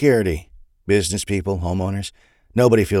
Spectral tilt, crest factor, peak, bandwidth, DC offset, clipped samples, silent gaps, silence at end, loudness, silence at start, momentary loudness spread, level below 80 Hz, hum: -5.5 dB/octave; 16 dB; -4 dBFS; 15.5 kHz; under 0.1%; under 0.1%; none; 0 s; -20 LUFS; 0 s; 14 LU; -40 dBFS; none